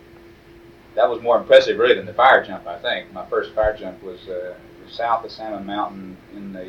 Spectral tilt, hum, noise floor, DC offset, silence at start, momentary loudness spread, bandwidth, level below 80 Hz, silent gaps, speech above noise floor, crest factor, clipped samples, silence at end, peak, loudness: -5 dB/octave; none; -46 dBFS; under 0.1%; 0.95 s; 21 LU; 8.2 kHz; -48 dBFS; none; 26 dB; 20 dB; under 0.1%; 0 s; 0 dBFS; -19 LUFS